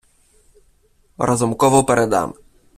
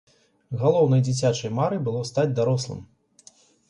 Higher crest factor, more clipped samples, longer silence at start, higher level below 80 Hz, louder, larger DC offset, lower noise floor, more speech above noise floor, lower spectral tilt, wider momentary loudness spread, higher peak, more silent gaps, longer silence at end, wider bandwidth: about the same, 18 dB vs 16 dB; neither; first, 1.2 s vs 0.5 s; first, -48 dBFS vs -60 dBFS; first, -17 LUFS vs -23 LUFS; neither; about the same, -57 dBFS vs -55 dBFS; first, 41 dB vs 32 dB; second, -5 dB/octave vs -6.5 dB/octave; about the same, 9 LU vs 11 LU; first, -2 dBFS vs -8 dBFS; neither; second, 0.45 s vs 0.85 s; first, 15 kHz vs 10.5 kHz